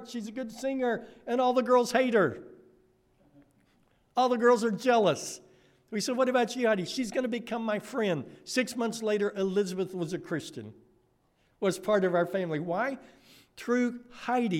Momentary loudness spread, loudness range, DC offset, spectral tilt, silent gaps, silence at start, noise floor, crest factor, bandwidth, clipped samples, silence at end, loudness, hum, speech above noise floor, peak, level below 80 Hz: 13 LU; 4 LU; under 0.1%; -5 dB/octave; none; 0 s; -69 dBFS; 18 dB; 16 kHz; under 0.1%; 0 s; -29 LUFS; none; 41 dB; -12 dBFS; -72 dBFS